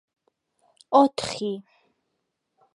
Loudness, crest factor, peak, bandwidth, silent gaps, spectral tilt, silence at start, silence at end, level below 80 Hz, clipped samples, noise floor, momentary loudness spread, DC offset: -23 LUFS; 22 dB; -6 dBFS; 11.5 kHz; none; -4.5 dB/octave; 0.9 s; 1.15 s; -66 dBFS; under 0.1%; -78 dBFS; 13 LU; under 0.1%